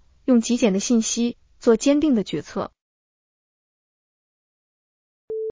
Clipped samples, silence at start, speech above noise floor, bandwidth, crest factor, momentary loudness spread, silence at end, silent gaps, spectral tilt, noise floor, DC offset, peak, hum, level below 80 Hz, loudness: under 0.1%; 0.25 s; over 70 dB; 7.6 kHz; 18 dB; 13 LU; 0 s; 2.81-5.28 s; -4.5 dB/octave; under -90 dBFS; under 0.1%; -4 dBFS; none; -56 dBFS; -21 LUFS